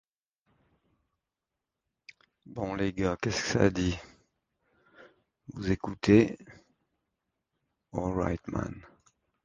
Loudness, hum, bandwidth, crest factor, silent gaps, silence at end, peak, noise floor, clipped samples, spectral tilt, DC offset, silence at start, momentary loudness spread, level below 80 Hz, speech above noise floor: -29 LUFS; none; 9.8 kHz; 26 dB; none; 0.65 s; -8 dBFS; -88 dBFS; under 0.1%; -6 dB/octave; under 0.1%; 2.5 s; 17 LU; -50 dBFS; 60 dB